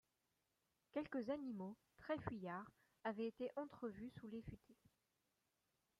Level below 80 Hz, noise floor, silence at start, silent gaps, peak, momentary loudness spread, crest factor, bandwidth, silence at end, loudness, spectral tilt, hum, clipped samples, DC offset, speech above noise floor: -76 dBFS; -88 dBFS; 0.95 s; none; -30 dBFS; 9 LU; 20 dB; 14.5 kHz; 1.25 s; -50 LUFS; -8 dB/octave; none; under 0.1%; under 0.1%; 39 dB